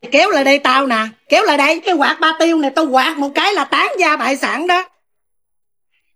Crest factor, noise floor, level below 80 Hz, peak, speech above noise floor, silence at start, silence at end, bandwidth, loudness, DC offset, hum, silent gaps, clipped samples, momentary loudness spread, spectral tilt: 14 dB; -78 dBFS; -70 dBFS; 0 dBFS; 64 dB; 0.05 s; 1.3 s; 16 kHz; -14 LUFS; under 0.1%; none; none; under 0.1%; 5 LU; -2 dB/octave